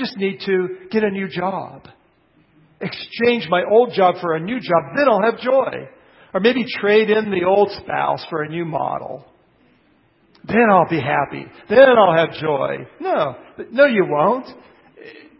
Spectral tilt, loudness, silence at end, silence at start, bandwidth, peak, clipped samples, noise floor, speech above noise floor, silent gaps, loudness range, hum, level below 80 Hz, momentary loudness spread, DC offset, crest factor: -10.5 dB/octave; -18 LUFS; 0.3 s; 0 s; 5.8 kHz; 0 dBFS; under 0.1%; -57 dBFS; 40 dB; none; 6 LU; none; -58 dBFS; 13 LU; under 0.1%; 18 dB